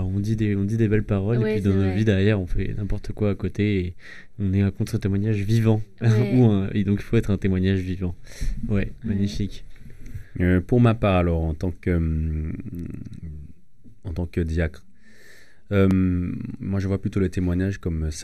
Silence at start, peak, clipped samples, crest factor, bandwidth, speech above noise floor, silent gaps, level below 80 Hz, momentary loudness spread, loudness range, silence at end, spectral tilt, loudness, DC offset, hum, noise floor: 0 s; -4 dBFS; under 0.1%; 18 dB; 12.5 kHz; 30 dB; none; -36 dBFS; 14 LU; 7 LU; 0 s; -8 dB/octave; -23 LUFS; 0.9%; none; -52 dBFS